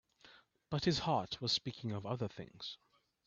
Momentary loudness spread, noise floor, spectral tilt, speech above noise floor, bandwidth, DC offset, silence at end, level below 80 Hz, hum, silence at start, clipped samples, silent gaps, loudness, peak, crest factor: 13 LU; -64 dBFS; -5 dB/octave; 26 dB; 8 kHz; under 0.1%; 0.5 s; -66 dBFS; none; 0.25 s; under 0.1%; none; -38 LUFS; -22 dBFS; 18 dB